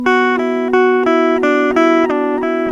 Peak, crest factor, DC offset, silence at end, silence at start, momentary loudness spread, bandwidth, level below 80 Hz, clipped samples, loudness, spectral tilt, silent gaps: 0 dBFS; 12 dB; under 0.1%; 0 s; 0 s; 4 LU; 7.6 kHz; -50 dBFS; under 0.1%; -13 LUFS; -5 dB/octave; none